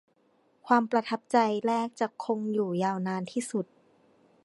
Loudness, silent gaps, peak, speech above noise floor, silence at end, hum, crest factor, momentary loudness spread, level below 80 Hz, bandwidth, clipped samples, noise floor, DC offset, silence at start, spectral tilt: -29 LUFS; none; -8 dBFS; 39 dB; 0.8 s; none; 22 dB; 8 LU; -80 dBFS; 11.5 kHz; under 0.1%; -67 dBFS; under 0.1%; 0.65 s; -5.5 dB/octave